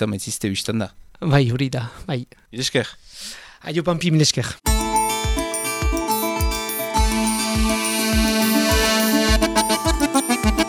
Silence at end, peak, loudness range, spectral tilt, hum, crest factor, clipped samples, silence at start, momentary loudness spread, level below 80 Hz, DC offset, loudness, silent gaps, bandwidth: 0 s; -4 dBFS; 5 LU; -4 dB/octave; none; 18 dB; under 0.1%; 0 s; 11 LU; -28 dBFS; under 0.1%; -20 LUFS; none; 19 kHz